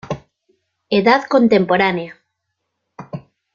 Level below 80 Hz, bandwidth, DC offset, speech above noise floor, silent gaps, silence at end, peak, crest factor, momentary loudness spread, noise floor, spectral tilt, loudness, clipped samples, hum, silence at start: -56 dBFS; 7.2 kHz; under 0.1%; 61 dB; none; 0.35 s; -2 dBFS; 16 dB; 20 LU; -75 dBFS; -6.5 dB/octave; -15 LUFS; under 0.1%; none; 0.05 s